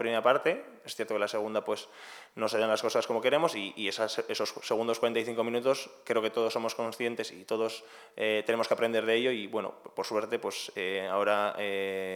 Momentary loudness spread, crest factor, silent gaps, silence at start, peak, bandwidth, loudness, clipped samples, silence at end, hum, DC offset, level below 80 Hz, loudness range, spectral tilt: 9 LU; 20 dB; none; 0 s; -10 dBFS; 18 kHz; -31 LUFS; under 0.1%; 0 s; none; under 0.1%; under -90 dBFS; 2 LU; -3.5 dB/octave